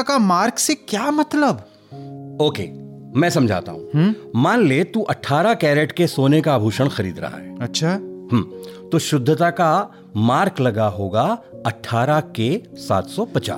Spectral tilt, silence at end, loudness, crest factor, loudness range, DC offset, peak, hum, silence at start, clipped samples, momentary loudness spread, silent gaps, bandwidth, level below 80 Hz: -5.5 dB/octave; 0 s; -19 LUFS; 14 dB; 3 LU; under 0.1%; -6 dBFS; none; 0 s; under 0.1%; 12 LU; none; 17 kHz; -62 dBFS